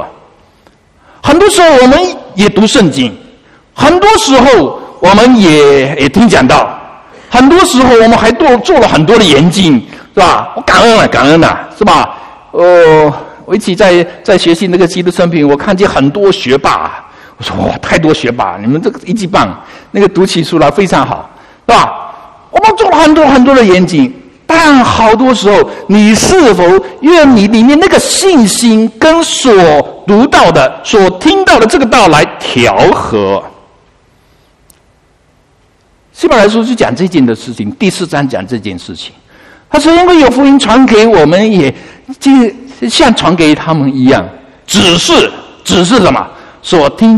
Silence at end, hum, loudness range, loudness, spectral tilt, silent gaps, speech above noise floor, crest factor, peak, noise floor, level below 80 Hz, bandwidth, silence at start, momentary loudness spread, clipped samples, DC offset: 0 s; none; 6 LU; -6 LUFS; -4.5 dB/octave; none; 42 dB; 6 dB; 0 dBFS; -48 dBFS; -32 dBFS; 13.5 kHz; 0 s; 10 LU; 3%; 0.5%